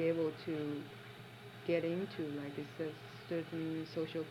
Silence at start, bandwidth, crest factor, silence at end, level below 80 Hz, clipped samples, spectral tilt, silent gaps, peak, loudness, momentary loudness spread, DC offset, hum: 0 s; 16 kHz; 18 dB; 0 s; -76 dBFS; under 0.1%; -7 dB/octave; none; -22 dBFS; -41 LUFS; 15 LU; under 0.1%; none